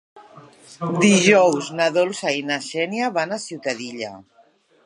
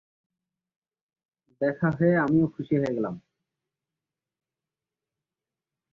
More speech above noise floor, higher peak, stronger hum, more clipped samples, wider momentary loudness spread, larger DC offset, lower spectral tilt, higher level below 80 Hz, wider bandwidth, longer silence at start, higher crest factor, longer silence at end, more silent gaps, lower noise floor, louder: second, 37 dB vs over 66 dB; first, -2 dBFS vs -10 dBFS; neither; neither; first, 15 LU vs 9 LU; neither; second, -4 dB/octave vs -10 dB/octave; second, -70 dBFS vs -64 dBFS; first, 11.5 kHz vs 6.8 kHz; second, 0.15 s vs 1.6 s; about the same, 20 dB vs 18 dB; second, 0.65 s vs 2.75 s; neither; second, -57 dBFS vs under -90 dBFS; first, -20 LUFS vs -25 LUFS